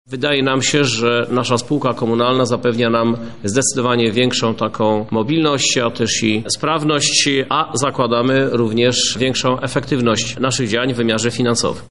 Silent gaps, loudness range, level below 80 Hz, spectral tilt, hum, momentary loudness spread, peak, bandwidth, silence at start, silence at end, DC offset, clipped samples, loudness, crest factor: none; 1 LU; -50 dBFS; -4 dB/octave; none; 4 LU; -2 dBFS; 11.5 kHz; 0.05 s; 0 s; 1%; under 0.1%; -16 LUFS; 16 dB